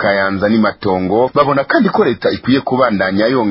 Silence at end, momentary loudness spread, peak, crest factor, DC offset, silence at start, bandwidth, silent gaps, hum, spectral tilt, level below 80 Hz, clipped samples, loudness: 0 s; 3 LU; 0 dBFS; 14 dB; under 0.1%; 0 s; 5.8 kHz; none; none; -10 dB/octave; -44 dBFS; under 0.1%; -14 LUFS